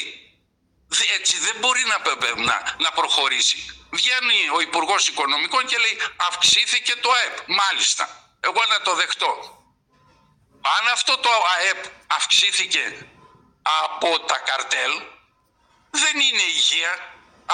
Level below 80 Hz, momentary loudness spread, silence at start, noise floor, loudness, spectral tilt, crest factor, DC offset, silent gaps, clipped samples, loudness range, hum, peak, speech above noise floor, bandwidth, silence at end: -66 dBFS; 9 LU; 0 s; -65 dBFS; -19 LUFS; 1.5 dB/octave; 16 dB; under 0.1%; none; under 0.1%; 4 LU; none; -6 dBFS; 44 dB; 17 kHz; 0 s